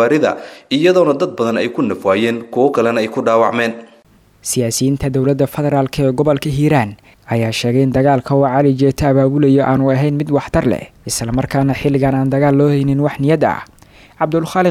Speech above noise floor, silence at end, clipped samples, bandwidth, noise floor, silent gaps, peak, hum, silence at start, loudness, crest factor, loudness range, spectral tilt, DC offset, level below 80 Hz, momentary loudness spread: 35 dB; 0 s; under 0.1%; 15 kHz; -49 dBFS; none; 0 dBFS; none; 0 s; -15 LUFS; 14 dB; 3 LU; -6 dB/octave; under 0.1%; -40 dBFS; 7 LU